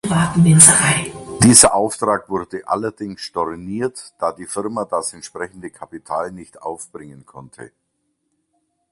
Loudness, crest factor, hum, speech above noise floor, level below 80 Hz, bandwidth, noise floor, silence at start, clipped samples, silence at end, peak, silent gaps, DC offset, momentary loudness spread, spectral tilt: -15 LUFS; 18 dB; none; 53 dB; -48 dBFS; 16 kHz; -71 dBFS; 0.05 s; under 0.1%; 1.25 s; 0 dBFS; none; under 0.1%; 22 LU; -3.5 dB/octave